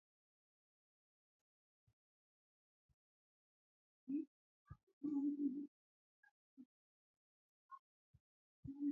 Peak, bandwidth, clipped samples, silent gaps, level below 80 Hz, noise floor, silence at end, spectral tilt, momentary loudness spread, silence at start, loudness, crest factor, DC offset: -32 dBFS; 2.6 kHz; under 0.1%; 4.27-4.65 s, 4.83-4.87 s, 4.93-5.01 s, 5.68-6.23 s, 6.31-6.57 s, 6.65-7.69 s, 7.79-8.14 s, 8.20-8.63 s; -82 dBFS; under -90 dBFS; 0 s; -8.5 dB/octave; 23 LU; 4.05 s; -46 LUFS; 20 dB; under 0.1%